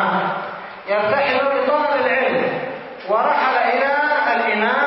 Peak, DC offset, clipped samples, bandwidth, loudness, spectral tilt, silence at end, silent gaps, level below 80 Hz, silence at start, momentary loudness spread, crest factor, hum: -4 dBFS; under 0.1%; under 0.1%; 5.8 kHz; -18 LUFS; -9 dB/octave; 0 s; none; -64 dBFS; 0 s; 10 LU; 14 dB; none